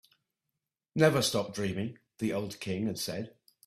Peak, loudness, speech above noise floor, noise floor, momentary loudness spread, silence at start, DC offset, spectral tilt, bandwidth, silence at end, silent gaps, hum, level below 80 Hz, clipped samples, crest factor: -10 dBFS; -31 LUFS; 57 dB; -87 dBFS; 14 LU; 0.95 s; under 0.1%; -4.5 dB/octave; 15.5 kHz; 0.4 s; none; none; -66 dBFS; under 0.1%; 22 dB